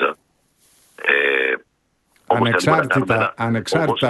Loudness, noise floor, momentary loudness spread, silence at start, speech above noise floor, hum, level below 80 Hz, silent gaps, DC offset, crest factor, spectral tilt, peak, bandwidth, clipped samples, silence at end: -18 LUFS; -66 dBFS; 7 LU; 0 s; 48 dB; none; -54 dBFS; none; under 0.1%; 18 dB; -5.5 dB/octave; -2 dBFS; 12 kHz; under 0.1%; 0 s